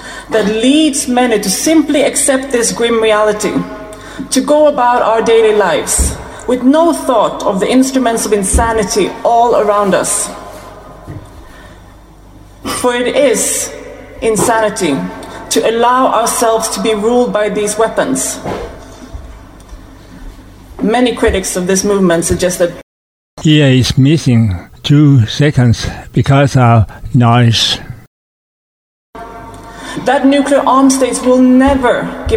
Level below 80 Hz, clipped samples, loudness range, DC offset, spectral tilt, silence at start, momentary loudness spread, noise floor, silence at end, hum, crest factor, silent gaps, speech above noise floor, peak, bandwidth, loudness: -32 dBFS; under 0.1%; 6 LU; under 0.1%; -5 dB/octave; 0 s; 16 LU; -37 dBFS; 0 s; none; 12 dB; 22.83-23.37 s, 28.07-29.13 s; 27 dB; 0 dBFS; 16.5 kHz; -11 LUFS